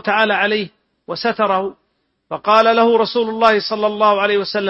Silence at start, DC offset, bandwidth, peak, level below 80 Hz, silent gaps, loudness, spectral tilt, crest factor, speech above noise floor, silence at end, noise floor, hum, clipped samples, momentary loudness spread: 0.05 s; under 0.1%; 8 kHz; 0 dBFS; -60 dBFS; none; -15 LUFS; -5.5 dB/octave; 16 dB; 52 dB; 0 s; -67 dBFS; none; under 0.1%; 12 LU